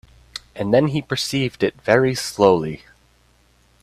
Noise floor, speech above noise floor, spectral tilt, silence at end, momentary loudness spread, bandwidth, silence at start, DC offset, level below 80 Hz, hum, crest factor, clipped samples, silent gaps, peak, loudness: -57 dBFS; 39 dB; -5 dB/octave; 1.05 s; 19 LU; 15 kHz; 0.35 s; under 0.1%; -52 dBFS; none; 20 dB; under 0.1%; none; 0 dBFS; -19 LUFS